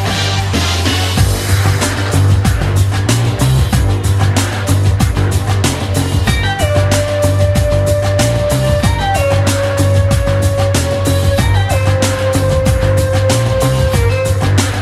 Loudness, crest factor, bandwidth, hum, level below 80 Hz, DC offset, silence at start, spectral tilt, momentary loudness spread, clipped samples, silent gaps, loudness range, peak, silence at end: -13 LUFS; 12 dB; 14 kHz; none; -22 dBFS; under 0.1%; 0 s; -5 dB/octave; 2 LU; under 0.1%; none; 1 LU; 0 dBFS; 0 s